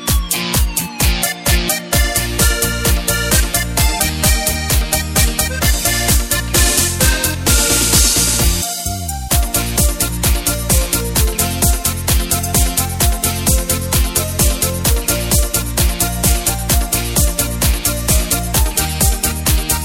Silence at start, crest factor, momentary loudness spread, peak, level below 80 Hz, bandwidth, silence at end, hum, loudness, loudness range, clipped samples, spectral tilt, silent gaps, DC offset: 0 s; 14 dB; 4 LU; 0 dBFS; -20 dBFS; 17 kHz; 0 s; none; -14 LUFS; 2 LU; under 0.1%; -3 dB/octave; none; under 0.1%